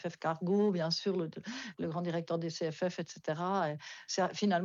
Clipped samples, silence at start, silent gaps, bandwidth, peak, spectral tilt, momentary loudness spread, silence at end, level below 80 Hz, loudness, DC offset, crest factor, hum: under 0.1%; 0 s; none; 7.6 kHz; -18 dBFS; -5.5 dB/octave; 9 LU; 0 s; -82 dBFS; -35 LUFS; under 0.1%; 16 dB; none